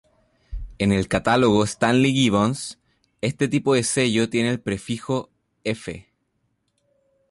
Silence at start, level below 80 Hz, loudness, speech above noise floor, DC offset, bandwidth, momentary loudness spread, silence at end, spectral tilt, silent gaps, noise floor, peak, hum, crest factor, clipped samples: 0.5 s; -44 dBFS; -21 LUFS; 51 dB; under 0.1%; 11.5 kHz; 15 LU; 1.3 s; -5 dB/octave; none; -71 dBFS; -6 dBFS; none; 16 dB; under 0.1%